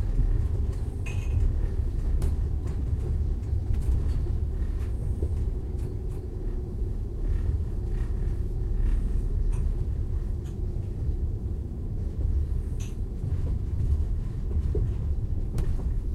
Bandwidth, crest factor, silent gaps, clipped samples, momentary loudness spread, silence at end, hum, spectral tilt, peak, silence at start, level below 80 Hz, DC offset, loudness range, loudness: 9.2 kHz; 14 dB; none; under 0.1%; 5 LU; 0 s; none; -8.5 dB/octave; -12 dBFS; 0 s; -28 dBFS; under 0.1%; 2 LU; -31 LUFS